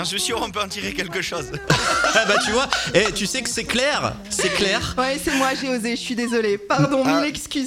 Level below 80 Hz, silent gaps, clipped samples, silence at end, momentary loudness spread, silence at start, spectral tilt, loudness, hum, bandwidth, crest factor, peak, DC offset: -44 dBFS; none; under 0.1%; 0 s; 7 LU; 0 s; -3 dB/octave; -20 LUFS; none; 16.5 kHz; 20 dB; 0 dBFS; under 0.1%